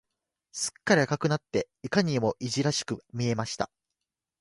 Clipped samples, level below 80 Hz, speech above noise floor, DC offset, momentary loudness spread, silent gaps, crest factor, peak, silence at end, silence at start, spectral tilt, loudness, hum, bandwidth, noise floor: under 0.1%; -62 dBFS; 58 dB; under 0.1%; 9 LU; none; 22 dB; -8 dBFS; 0.75 s; 0.55 s; -4.5 dB/octave; -28 LUFS; none; 11.5 kHz; -86 dBFS